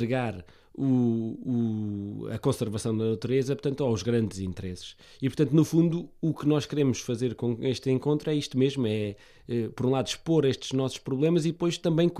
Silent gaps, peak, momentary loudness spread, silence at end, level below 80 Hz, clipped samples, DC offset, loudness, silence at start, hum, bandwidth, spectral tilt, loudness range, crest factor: none; -10 dBFS; 10 LU; 0 s; -58 dBFS; under 0.1%; under 0.1%; -28 LUFS; 0 s; none; 14 kHz; -6.5 dB/octave; 2 LU; 18 dB